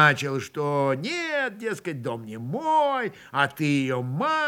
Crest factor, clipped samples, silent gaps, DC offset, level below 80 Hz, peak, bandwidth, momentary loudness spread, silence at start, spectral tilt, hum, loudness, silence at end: 22 dB; under 0.1%; none; under 0.1%; -74 dBFS; -4 dBFS; 17 kHz; 9 LU; 0 s; -5.5 dB/octave; none; -26 LUFS; 0 s